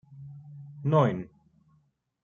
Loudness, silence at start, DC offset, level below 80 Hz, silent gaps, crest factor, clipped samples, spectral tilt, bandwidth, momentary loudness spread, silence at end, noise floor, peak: -27 LUFS; 0.1 s; under 0.1%; -66 dBFS; none; 20 dB; under 0.1%; -9 dB/octave; 7 kHz; 22 LU; 1 s; -69 dBFS; -10 dBFS